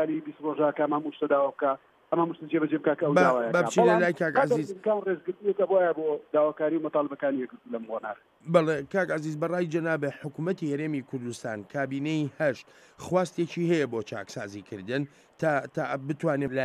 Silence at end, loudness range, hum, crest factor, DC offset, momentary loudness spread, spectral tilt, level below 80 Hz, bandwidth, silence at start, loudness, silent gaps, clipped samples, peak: 0 s; 6 LU; none; 20 dB; under 0.1%; 12 LU; -6.5 dB/octave; -72 dBFS; 12.5 kHz; 0 s; -28 LUFS; none; under 0.1%; -8 dBFS